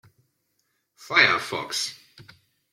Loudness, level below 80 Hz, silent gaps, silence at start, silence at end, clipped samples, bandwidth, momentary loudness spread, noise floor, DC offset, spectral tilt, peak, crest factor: -22 LUFS; -72 dBFS; none; 1 s; 0.5 s; under 0.1%; 16.5 kHz; 11 LU; -74 dBFS; under 0.1%; -1.5 dB/octave; -4 dBFS; 24 dB